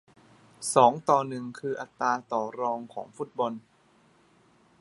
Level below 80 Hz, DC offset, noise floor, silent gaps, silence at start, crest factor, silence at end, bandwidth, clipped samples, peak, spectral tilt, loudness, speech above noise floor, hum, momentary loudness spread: -76 dBFS; under 0.1%; -62 dBFS; none; 0.6 s; 24 dB; 1.2 s; 11.5 kHz; under 0.1%; -4 dBFS; -4.5 dB/octave; -28 LUFS; 35 dB; none; 16 LU